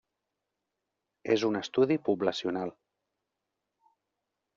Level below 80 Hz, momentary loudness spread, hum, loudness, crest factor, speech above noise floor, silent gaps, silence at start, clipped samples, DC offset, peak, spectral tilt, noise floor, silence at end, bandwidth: -76 dBFS; 10 LU; none; -29 LUFS; 20 dB; 57 dB; none; 1.25 s; under 0.1%; under 0.1%; -12 dBFS; -4.5 dB/octave; -86 dBFS; 1.85 s; 7.4 kHz